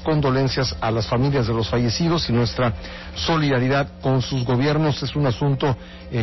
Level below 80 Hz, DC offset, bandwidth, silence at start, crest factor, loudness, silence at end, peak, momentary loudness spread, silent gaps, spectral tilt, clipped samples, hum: -38 dBFS; 0.2%; 6.2 kHz; 0 s; 8 dB; -21 LUFS; 0 s; -12 dBFS; 5 LU; none; -6.5 dB/octave; under 0.1%; none